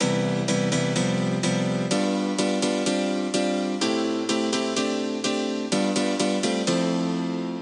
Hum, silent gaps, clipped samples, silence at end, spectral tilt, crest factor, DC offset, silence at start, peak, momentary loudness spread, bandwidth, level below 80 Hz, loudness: none; none; under 0.1%; 0 s; -4.5 dB/octave; 14 dB; under 0.1%; 0 s; -10 dBFS; 2 LU; 11.5 kHz; -68 dBFS; -24 LUFS